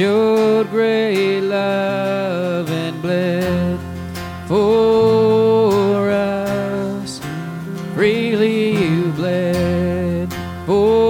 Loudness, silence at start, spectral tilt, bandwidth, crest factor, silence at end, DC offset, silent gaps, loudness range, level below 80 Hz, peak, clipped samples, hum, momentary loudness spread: -17 LUFS; 0 s; -6.5 dB/octave; 17 kHz; 12 dB; 0 s; under 0.1%; none; 3 LU; -44 dBFS; -4 dBFS; under 0.1%; none; 12 LU